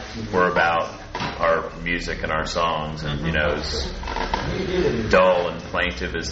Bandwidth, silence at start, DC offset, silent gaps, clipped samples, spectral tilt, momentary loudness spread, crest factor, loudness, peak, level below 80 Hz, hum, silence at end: 8 kHz; 0 s; under 0.1%; none; under 0.1%; -3.5 dB/octave; 9 LU; 18 dB; -22 LUFS; -4 dBFS; -36 dBFS; none; 0 s